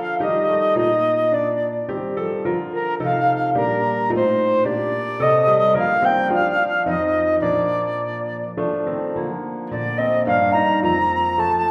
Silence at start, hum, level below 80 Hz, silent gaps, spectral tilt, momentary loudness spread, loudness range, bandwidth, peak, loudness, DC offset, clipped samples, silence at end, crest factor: 0 s; none; -52 dBFS; none; -8.5 dB/octave; 8 LU; 4 LU; 6.2 kHz; -6 dBFS; -20 LUFS; under 0.1%; under 0.1%; 0 s; 14 dB